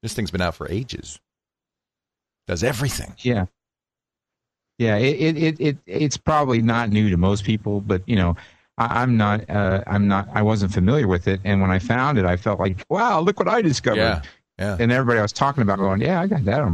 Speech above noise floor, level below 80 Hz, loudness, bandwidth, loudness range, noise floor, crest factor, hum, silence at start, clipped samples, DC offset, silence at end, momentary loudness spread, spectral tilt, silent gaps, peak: 70 dB; -42 dBFS; -21 LUFS; 13.5 kHz; 7 LU; -90 dBFS; 20 dB; none; 0.05 s; under 0.1%; under 0.1%; 0 s; 8 LU; -6.5 dB/octave; none; -2 dBFS